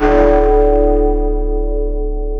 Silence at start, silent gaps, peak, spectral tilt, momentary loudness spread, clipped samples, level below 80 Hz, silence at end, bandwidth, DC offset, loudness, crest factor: 0 s; none; 0 dBFS; -9 dB/octave; 9 LU; under 0.1%; -16 dBFS; 0 s; 4.4 kHz; under 0.1%; -14 LUFS; 12 dB